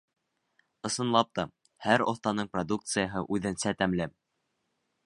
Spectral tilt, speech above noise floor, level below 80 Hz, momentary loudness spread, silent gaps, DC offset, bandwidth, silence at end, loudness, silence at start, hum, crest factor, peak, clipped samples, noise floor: -4.5 dB/octave; 50 dB; -60 dBFS; 10 LU; none; under 0.1%; 11.5 kHz; 0.95 s; -30 LUFS; 0.85 s; none; 24 dB; -6 dBFS; under 0.1%; -79 dBFS